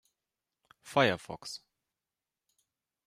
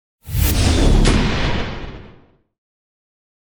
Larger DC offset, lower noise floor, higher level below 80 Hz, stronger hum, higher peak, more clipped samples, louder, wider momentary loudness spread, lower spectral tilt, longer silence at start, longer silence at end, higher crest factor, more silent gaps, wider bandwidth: neither; first, under -90 dBFS vs -48 dBFS; second, -74 dBFS vs -22 dBFS; neither; second, -10 dBFS vs -2 dBFS; neither; second, -30 LUFS vs -18 LUFS; about the same, 16 LU vs 14 LU; about the same, -4.5 dB/octave vs -5 dB/octave; first, 0.85 s vs 0.25 s; about the same, 1.5 s vs 1.4 s; first, 26 dB vs 16 dB; neither; second, 15.5 kHz vs over 20 kHz